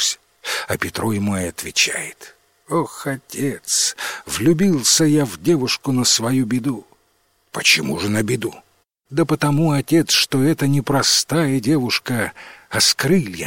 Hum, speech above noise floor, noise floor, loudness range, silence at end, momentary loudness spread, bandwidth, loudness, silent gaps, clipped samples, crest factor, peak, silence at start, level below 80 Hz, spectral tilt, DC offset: none; 44 dB; -62 dBFS; 4 LU; 0 s; 11 LU; 16.5 kHz; -18 LUFS; none; under 0.1%; 18 dB; -2 dBFS; 0 s; -52 dBFS; -3.5 dB/octave; under 0.1%